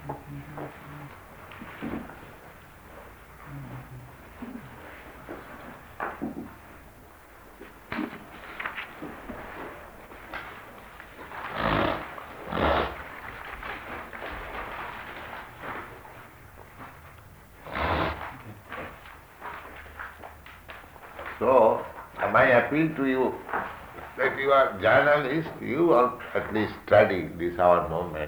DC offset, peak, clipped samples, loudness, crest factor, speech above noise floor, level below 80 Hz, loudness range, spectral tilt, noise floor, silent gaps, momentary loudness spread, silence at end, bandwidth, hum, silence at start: under 0.1%; -6 dBFS; under 0.1%; -26 LUFS; 22 dB; 27 dB; -50 dBFS; 18 LU; -6.5 dB/octave; -50 dBFS; none; 25 LU; 0 s; over 20 kHz; none; 0 s